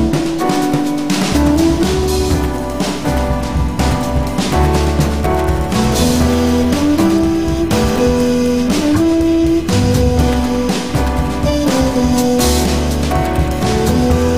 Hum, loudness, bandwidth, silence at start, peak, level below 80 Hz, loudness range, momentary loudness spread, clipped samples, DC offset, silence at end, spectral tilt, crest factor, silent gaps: none; -14 LUFS; 16 kHz; 0 s; -2 dBFS; -22 dBFS; 2 LU; 4 LU; under 0.1%; 3%; 0 s; -5.5 dB/octave; 12 dB; none